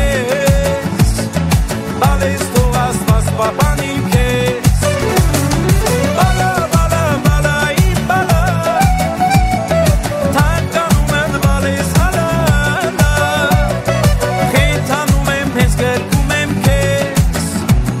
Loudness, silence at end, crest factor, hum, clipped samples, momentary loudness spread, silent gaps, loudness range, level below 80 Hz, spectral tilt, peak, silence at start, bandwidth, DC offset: -14 LUFS; 0 s; 12 dB; none; under 0.1%; 2 LU; none; 1 LU; -20 dBFS; -5.5 dB/octave; 0 dBFS; 0 s; 16.5 kHz; under 0.1%